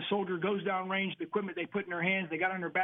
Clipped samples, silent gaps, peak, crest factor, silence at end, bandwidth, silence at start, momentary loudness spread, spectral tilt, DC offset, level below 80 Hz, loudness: under 0.1%; none; -16 dBFS; 16 dB; 0 s; 3.9 kHz; 0 s; 5 LU; -8.5 dB/octave; under 0.1%; -78 dBFS; -33 LUFS